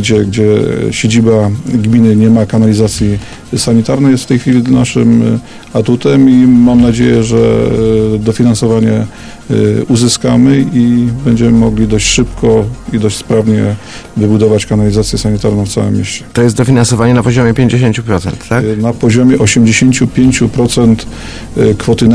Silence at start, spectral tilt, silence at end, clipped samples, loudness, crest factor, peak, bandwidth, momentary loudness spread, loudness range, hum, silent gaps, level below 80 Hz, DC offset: 0 s; -6 dB/octave; 0 s; 0.6%; -9 LUFS; 8 dB; 0 dBFS; 11 kHz; 7 LU; 3 LU; none; none; -30 dBFS; under 0.1%